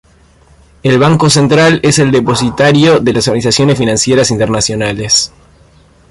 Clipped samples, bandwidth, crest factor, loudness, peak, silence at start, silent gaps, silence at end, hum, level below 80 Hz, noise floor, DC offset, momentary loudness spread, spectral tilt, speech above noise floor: under 0.1%; 11.5 kHz; 10 dB; -9 LUFS; 0 dBFS; 0.85 s; none; 0.85 s; none; -38 dBFS; -44 dBFS; under 0.1%; 5 LU; -4.5 dB/octave; 35 dB